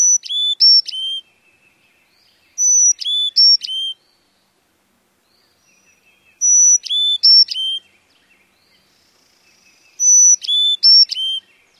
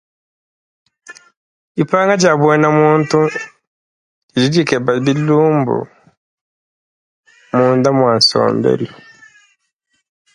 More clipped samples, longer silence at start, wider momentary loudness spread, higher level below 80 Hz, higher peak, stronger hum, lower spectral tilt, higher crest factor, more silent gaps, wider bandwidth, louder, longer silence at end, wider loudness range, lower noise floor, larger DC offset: neither; second, 0 s vs 1.1 s; first, 14 LU vs 11 LU; second, -78 dBFS vs -58 dBFS; about the same, -2 dBFS vs 0 dBFS; neither; second, 7 dB/octave vs -5.5 dB/octave; about the same, 14 dB vs 16 dB; second, none vs 1.37-1.75 s, 3.67-4.28 s, 6.17-7.23 s; first, 14 kHz vs 11 kHz; first, -10 LUFS vs -13 LUFS; second, 0.4 s vs 1.4 s; about the same, 4 LU vs 3 LU; second, -61 dBFS vs -67 dBFS; neither